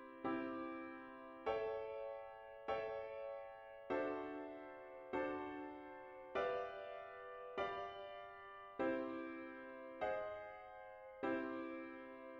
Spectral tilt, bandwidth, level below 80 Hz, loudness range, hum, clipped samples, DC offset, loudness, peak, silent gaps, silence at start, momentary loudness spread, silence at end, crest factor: -6.5 dB/octave; 7.4 kHz; -76 dBFS; 2 LU; none; under 0.1%; under 0.1%; -47 LUFS; -28 dBFS; none; 0 s; 12 LU; 0 s; 18 dB